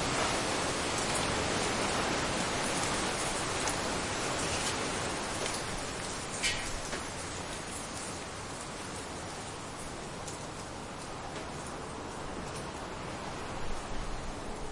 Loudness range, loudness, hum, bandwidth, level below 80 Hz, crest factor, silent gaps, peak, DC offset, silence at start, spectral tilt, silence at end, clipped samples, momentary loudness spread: 9 LU; -34 LUFS; none; 11.5 kHz; -48 dBFS; 18 dB; none; -18 dBFS; under 0.1%; 0 s; -2.5 dB/octave; 0 s; under 0.1%; 10 LU